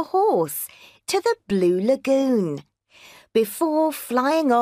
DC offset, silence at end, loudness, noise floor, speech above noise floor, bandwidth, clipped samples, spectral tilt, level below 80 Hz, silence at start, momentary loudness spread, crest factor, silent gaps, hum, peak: under 0.1%; 0 s; -22 LUFS; -50 dBFS; 29 dB; 15.5 kHz; under 0.1%; -5 dB/octave; -66 dBFS; 0 s; 9 LU; 14 dB; none; none; -8 dBFS